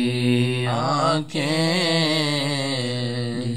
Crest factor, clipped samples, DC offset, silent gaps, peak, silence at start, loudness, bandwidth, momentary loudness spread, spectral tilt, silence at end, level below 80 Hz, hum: 14 dB; under 0.1%; 0.7%; none; -8 dBFS; 0 s; -21 LUFS; 13 kHz; 6 LU; -5 dB/octave; 0 s; -62 dBFS; none